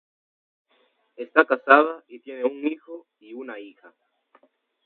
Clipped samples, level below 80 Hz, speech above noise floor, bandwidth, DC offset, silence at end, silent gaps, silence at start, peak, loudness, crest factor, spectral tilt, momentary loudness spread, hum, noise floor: under 0.1%; -82 dBFS; 43 dB; 4.5 kHz; under 0.1%; 1.2 s; none; 1.2 s; 0 dBFS; -21 LUFS; 26 dB; -5.5 dB/octave; 25 LU; none; -66 dBFS